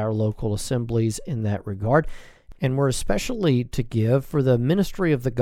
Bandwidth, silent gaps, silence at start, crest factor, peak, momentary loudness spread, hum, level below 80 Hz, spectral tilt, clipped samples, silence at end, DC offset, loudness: 15.5 kHz; none; 0 s; 18 dB; -4 dBFS; 6 LU; none; -38 dBFS; -6.5 dB/octave; under 0.1%; 0 s; under 0.1%; -23 LUFS